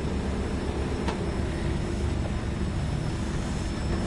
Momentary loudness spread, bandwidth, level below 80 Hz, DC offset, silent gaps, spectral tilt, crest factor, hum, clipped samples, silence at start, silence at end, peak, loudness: 1 LU; 11.5 kHz; -34 dBFS; under 0.1%; none; -6.5 dB/octave; 16 dB; none; under 0.1%; 0 s; 0 s; -12 dBFS; -30 LUFS